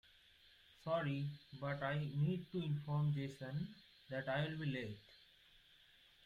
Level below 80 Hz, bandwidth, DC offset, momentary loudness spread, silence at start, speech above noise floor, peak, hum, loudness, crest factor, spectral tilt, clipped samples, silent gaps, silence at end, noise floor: -72 dBFS; 7.2 kHz; under 0.1%; 12 LU; 0.85 s; 27 dB; -26 dBFS; none; -42 LUFS; 16 dB; -8 dB/octave; under 0.1%; none; 1 s; -68 dBFS